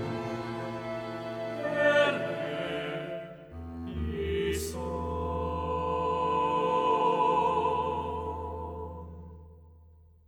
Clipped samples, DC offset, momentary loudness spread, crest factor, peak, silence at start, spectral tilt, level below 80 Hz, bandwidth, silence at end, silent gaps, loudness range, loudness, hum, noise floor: under 0.1%; under 0.1%; 15 LU; 18 dB; -12 dBFS; 0 s; -5.5 dB/octave; -46 dBFS; over 20 kHz; 0.4 s; none; 6 LU; -30 LUFS; none; -56 dBFS